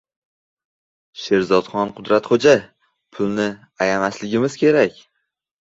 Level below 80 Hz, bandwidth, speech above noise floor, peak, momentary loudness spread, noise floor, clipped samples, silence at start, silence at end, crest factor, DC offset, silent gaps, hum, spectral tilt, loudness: -58 dBFS; 8 kHz; 57 dB; -2 dBFS; 9 LU; -75 dBFS; under 0.1%; 1.15 s; 0.7 s; 18 dB; under 0.1%; none; none; -5.5 dB/octave; -19 LUFS